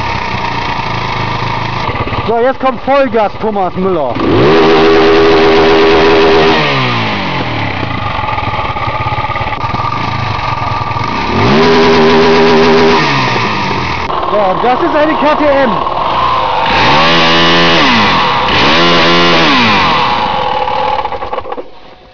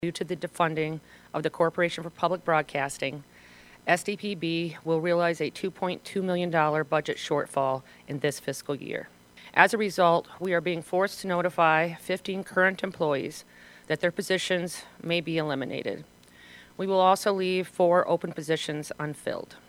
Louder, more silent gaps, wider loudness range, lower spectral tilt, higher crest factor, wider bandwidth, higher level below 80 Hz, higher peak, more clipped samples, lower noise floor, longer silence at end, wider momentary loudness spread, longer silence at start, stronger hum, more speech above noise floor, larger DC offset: first, -9 LUFS vs -27 LUFS; neither; first, 7 LU vs 4 LU; about the same, -5.5 dB/octave vs -5 dB/octave; second, 8 dB vs 26 dB; second, 5.4 kHz vs 16.5 kHz; first, -32 dBFS vs -68 dBFS; about the same, -4 dBFS vs -2 dBFS; neither; second, -33 dBFS vs -52 dBFS; about the same, 0 s vs 0.1 s; second, 9 LU vs 12 LU; about the same, 0 s vs 0 s; neither; about the same, 24 dB vs 25 dB; first, 7% vs under 0.1%